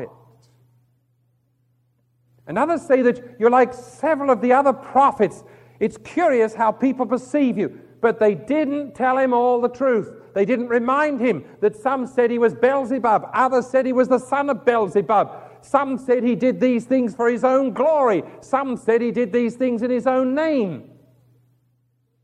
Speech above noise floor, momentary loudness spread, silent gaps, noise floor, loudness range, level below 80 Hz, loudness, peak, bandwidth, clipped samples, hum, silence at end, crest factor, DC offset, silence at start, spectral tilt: 47 dB; 6 LU; none; -66 dBFS; 3 LU; -64 dBFS; -20 LUFS; -2 dBFS; 10.5 kHz; under 0.1%; none; 1.4 s; 18 dB; under 0.1%; 0 s; -6.5 dB/octave